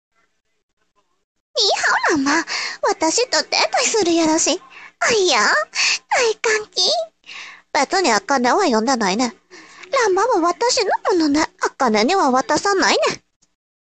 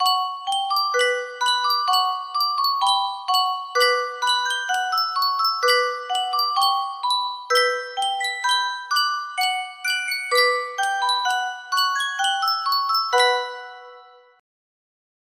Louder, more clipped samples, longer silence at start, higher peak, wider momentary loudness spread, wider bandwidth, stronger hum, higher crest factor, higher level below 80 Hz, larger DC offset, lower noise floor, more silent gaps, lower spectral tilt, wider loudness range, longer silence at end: first, -17 LUFS vs -21 LUFS; neither; first, 1.55 s vs 0 s; first, 0 dBFS vs -6 dBFS; about the same, 7 LU vs 5 LU; second, 9.2 kHz vs 16 kHz; neither; about the same, 18 dB vs 16 dB; first, -58 dBFS vs -76 dBFS; neither; second, -42 dBFS vs -47 dBFS; neither; first, -1.5 dB/octave vs 3.5 dB/octave; about the same, 2 LU vs 2 LU; second, 0.7 s vs 1.35 s